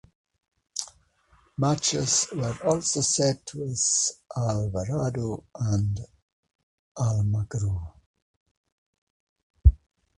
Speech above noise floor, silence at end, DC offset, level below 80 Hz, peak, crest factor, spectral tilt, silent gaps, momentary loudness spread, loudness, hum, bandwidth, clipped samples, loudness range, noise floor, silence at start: 36 dB; 0.4 s; under 0.1%; -36 dBFS; -4 dBFS; 24 dB; -4.5 dB/octave; 6.22-6.43 s, 6.55-6.95 s, 8.06-8.14 s, 8.22-8.64 s, 8.72-9.36 s, 9.43-9.54 s; 12 LU; -26 LUFS; none; 11.5 kHz; under 0.1%; 7 LU; -62 dBFS; 0.75 s